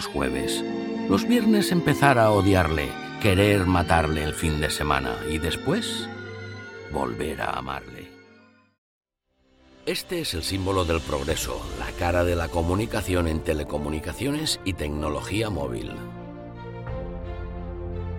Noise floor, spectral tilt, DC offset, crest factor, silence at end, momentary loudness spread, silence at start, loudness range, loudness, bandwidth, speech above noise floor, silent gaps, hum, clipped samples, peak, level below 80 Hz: -67 dBFS; -5 dB/octave; under 0.1%; 22 dB; 0 s; 15 LU; 0 s; 12 LU; -25 LUFS; 17.5 kHz; 43 dB; 8.78-9.01 s; none; under 0.1%; -4 dBFS; -38 dBFS